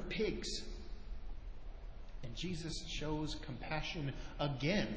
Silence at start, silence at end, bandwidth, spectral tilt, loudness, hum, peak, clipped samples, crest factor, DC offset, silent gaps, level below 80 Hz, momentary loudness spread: 0 s; 0 s; 8 kHz; -5 dB/octave; -41 LUFS; none; -22 dBFS; under 0.1%; 20 dB; under 0.1%; none; -48 dBFS; 16 LU